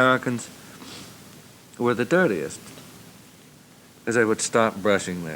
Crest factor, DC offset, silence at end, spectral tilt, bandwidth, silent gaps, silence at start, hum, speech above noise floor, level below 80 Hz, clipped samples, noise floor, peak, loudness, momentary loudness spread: 20 dB; under 0.1%; 0 s; -4.5 dB/octave; over 20 kHz; none; 0 s; none; 28 dB; -68 dBFS; under 0.1%; -50 dBFS; -6 dBFS; -23 LUFS; 23 LU